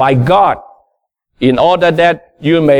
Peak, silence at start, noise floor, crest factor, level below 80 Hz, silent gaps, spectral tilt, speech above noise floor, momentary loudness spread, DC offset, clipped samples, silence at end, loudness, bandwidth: 0 dBFS; 0 s; -66 dBFS; 10 dB; -44 dBFS; none; -7.5 dB/octave; 56 dB; 6 LU; under 0.1%; under 0.1%; 0 s; -11 LUFS; 11 kHz